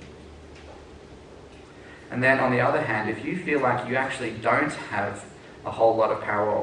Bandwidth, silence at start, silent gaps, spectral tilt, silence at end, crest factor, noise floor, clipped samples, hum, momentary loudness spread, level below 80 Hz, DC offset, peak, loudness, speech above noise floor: 10 kHz; 0 s; none; -6 dB/octave; 0 s; 20 dB; -46 dBFS; under 0.1%; none; 24 LU; -56 dBFS; under 0.1%; -6 dBFS; -24 LUFS; 22 dB